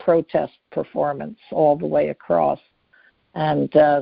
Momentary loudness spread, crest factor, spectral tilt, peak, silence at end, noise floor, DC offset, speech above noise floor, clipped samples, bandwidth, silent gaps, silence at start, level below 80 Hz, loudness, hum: 12 LU; 18 dB; -6 dB/octave; -2 dBFS; 0 s; -58 dBFS; under 0.1%; 38 dB; under 0.1%; 5.2 kHz; none; 0 s; -56 dBFS; -21 LUFS; none